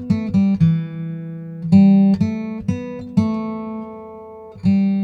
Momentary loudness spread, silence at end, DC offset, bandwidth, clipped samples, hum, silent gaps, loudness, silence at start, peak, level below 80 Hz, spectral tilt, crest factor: 19 LU; 0 s; under 0.1%; 6.2 kHz; under 0.1%; none; none; -18 LUFS; 0 s; -2 dBFS; -48 dBFS; -9.5 dB/octave; 16 dB